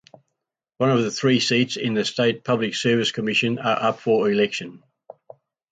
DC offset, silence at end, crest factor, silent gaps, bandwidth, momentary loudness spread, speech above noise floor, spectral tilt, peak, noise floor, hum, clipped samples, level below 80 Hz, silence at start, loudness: under 0.1%; 0.95 s; 16 dB; none; 9.2 kHz; 4 LU; 61 dB; -4.5 dB/octave; -8 dBFS; -82 dBFS; none; under 0.1%; -66 dBFS; 0.8 s; -21 LUFS